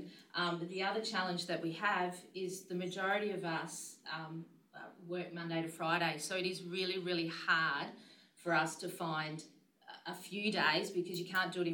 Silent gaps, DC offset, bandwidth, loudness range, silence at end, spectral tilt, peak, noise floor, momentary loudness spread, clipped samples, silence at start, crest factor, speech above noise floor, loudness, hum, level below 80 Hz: none; under 0.1%; 18 kHz; 4 LU; 0 s; -4 dB/octave; -18 dBFS; -58 dBFS; 14 LU; under 0.1%; 0 s; 20 dB; 20 dB; -37 LUFS; none; under -90 dBFS